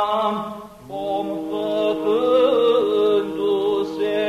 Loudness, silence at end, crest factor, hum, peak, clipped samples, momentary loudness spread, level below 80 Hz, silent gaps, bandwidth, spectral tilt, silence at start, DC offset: -20 LUFS; 0 s; 12 dB; none; -8 dBFS; under 0.1%; 12 LU; -58 dBFS; none; 13.5 kHz; -6 dB/octave; 0 s; under 0.1%